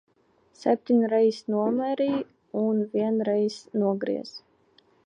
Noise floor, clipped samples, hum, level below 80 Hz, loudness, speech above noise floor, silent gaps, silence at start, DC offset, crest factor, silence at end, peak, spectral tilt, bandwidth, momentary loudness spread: -63 dBFS; under 0.1%; none; -74 dBFS; -26 LUFS; 39 dB; none; 0.6 s; under 0.1%; 16 dB; 0.7 s; -10 dBFS; -7 dB/octave; 9.6 kHz; 9 LU